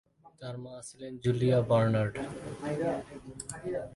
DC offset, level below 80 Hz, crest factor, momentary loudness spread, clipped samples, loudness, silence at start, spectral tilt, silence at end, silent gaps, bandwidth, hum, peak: under 0.1%; -60 dBFS; 18 dB; 17 LU; under 0.1%; -31 LUFS; 0.25 s; -7 dB/octave; 0 s; none; 11.5 kHz; none; -14 dBFS